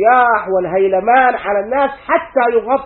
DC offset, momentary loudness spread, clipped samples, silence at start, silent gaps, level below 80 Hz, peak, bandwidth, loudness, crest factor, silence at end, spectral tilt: under 0.1%; 6 LU; under 0.1%; 0 s; none; -48 dBFS; 0 dBFS; 4.2 kHz; -14 LUFS; 14 dB; 0 s; -10 dB/octave